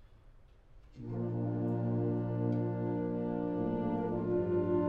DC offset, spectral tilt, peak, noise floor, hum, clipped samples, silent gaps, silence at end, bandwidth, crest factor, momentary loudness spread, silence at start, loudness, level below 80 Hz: under 0.1%; -11.5 dB/octave; -20 dBFS; -58 dBFS; none; under 0.1%; none; 0 s; 4.1 kHz; 14 dB; 4 LU; 0 s; -34 LUFS; -58 dBFS